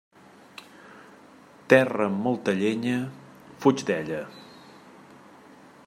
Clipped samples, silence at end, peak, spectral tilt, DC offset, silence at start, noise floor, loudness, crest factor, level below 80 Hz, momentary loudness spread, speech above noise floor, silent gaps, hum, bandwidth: under 0.1%; 1.45 s; -2 dBFS; -6 dB/octave; under 0.1%; 0.85 s; -51 dBFS; -25 LUFS; 26 dB; -72 dBFS; 26 LU; 28 dB; none; none; 16 kHz